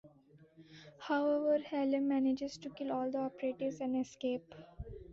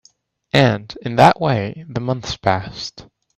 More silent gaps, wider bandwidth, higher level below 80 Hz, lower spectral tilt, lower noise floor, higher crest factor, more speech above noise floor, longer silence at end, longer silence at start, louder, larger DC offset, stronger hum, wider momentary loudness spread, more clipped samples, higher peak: neither; second, 7.6 kHz vs 14 kHz; second, -62 dBFS vs -48 dBFS; about the same, -5 dB/octave vs -6 dB/octave; first, -63 dBFS vs -56 dBFS; about the same, 14 dB vs 18 dB; second, 28 dB vs 39 dB; second, 0 s vs 0.35 s; second, 0.05 s vs 0.55 s; second, -36 LUFS vs -18 LUFS; neither; neither; first, 18 LU vs 14 LU; neither; second, -22 dBFS vs 0 dBFS